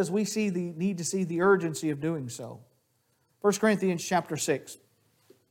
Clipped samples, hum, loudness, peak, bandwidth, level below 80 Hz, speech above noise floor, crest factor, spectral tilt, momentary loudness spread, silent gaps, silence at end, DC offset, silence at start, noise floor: under 0.1%; none; -28 LUFS; -10 dBFS; 17 kHz; -74 dBFS; 44 dB; 18 dB; -5 dB/octave; 14 LU; none; 0.75 s; under 0.1%; 0 s; -72 dBFS